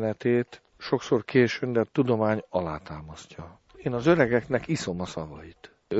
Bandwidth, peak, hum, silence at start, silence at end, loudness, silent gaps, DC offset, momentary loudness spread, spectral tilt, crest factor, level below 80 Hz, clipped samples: 8.2 kHz; -6 dBFS; none; 0 s; 0 s; -26 LUFS; none; under 0.1%; 20 LU; -6.5 dB/octave; 20 dB; -54 dBFS; under 0.1%